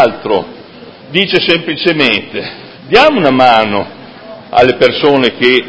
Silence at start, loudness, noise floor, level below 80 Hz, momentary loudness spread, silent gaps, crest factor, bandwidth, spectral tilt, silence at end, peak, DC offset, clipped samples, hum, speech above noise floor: 0 s; -10 LUFS; -33 dBFS; -46 dBFS; 15 LU; none; 12 dB; 8 kHz; -5.5 dB/octave; 0 s; 0 dBFS; under 0.1%; 0.9%; none; 23 dB